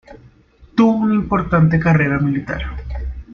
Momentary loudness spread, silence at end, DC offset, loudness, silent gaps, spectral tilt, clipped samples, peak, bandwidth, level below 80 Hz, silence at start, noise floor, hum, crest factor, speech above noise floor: 14 LU; 0 s; under 0.1%; -16 LUFS; none; -9 dB/octave; under 0.1%; -2 dBFS; 6.6 kHz; -32 dBFS; 0.1 s; -48 dBFS; none; 16 dB; 32 dB